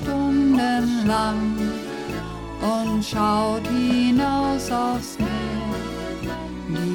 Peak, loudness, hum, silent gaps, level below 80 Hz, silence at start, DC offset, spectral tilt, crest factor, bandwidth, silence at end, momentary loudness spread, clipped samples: -10 dBFS; -23 LUFS; none; none; -40 dBFS; 0 s; under 0.1%; -5.5 dB/octave; 12 dB; 17.5 kHz; 0 s; 11 LU; under 0.1%